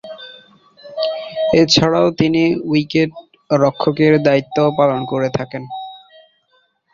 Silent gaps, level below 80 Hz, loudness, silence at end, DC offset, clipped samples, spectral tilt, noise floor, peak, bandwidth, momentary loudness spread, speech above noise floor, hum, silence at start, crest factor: none; -50 dBFS; -16 LUFS; 0.95 s; under 0.1%; under 0.1%; -5.5 dB/octave; -61 dBFS; 0 dBFS; 7.6 kHz; 18 LU; 46 dB; none; 0.05 s; 16 dB